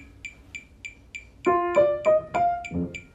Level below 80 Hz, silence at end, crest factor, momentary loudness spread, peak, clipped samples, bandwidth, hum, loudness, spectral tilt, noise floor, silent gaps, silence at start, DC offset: -52 dBFS; 0.1 s; 18 dB; 20 LU; -8 dBFS; under 0.1%; 8.2 kHz; none; -24 LUFS; -6.5 dB/octave; -45 dBFS; none; 0 s; under 0.1%